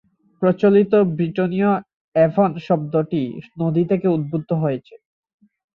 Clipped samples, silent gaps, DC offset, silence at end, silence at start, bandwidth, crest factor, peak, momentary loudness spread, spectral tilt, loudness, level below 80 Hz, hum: under 0.1%; 1.94-2.12 s; under 0.1%; 0.8 s; 0.4 s; 5.4 kHz; 16 dB; -4 dBFS; 9 LU; -10.5 dB/octave; -19 LUFS; -60 dBFS; none